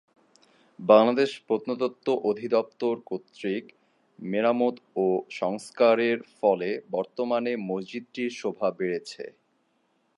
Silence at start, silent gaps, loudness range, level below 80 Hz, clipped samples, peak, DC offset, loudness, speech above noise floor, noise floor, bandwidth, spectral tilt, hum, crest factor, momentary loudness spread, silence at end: 0.8 s; none; 4 LU; -80 dBFS; under 0.1%; -4 dBFS; under 0.1%; -26 LUFS; 45 dB; -70 dBFS; 11.5 kHz; -6 dB/octave; none; 22 dB; 12 LU; 0.9 s